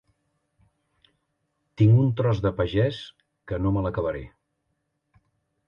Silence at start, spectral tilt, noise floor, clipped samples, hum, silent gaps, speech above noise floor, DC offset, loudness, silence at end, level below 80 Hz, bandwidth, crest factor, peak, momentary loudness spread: 1.8 s; -9 dB/octave; -76 dBFS; under 0.1%; none; none; 54 dB; under 0.1%; -24 LUFS; 1.4 s; -46 dBFS; 6.8 kHz; 18 dB; -8 dBFS; 17 LU